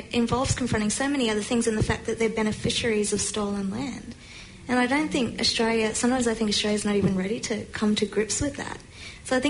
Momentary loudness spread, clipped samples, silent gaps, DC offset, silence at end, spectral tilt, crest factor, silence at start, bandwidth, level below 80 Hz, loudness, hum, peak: 12 LU; under 0.1%; none; under 0.1%; 0 s; -4 dB/octave; 14 dB; 0 s; 11 kHz; -46 dBFS; -25 LUFS; none; -12 dBFS